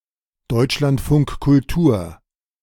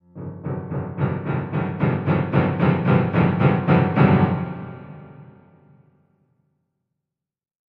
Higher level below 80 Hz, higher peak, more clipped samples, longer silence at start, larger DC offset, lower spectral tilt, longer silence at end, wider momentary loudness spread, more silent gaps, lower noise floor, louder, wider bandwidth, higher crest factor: first, -34 dBFS vs -48 dBFS; about the same, -4 dBFS vs -2 dBFS; neither; first, 0.5 s vs 0.15 s; neither; second, -7 dB/octave vs -11 dB/octave; second, 0.5 s vs 2.45 s; second, 8 LU vs 18 LU; neither; second, -54 dBFS vs -88 dBFS; about the same, -18 LUFS vs -20 LUFS; first, 17 kHz vs 4.9 kHz; second, 14 dB vs 20 dB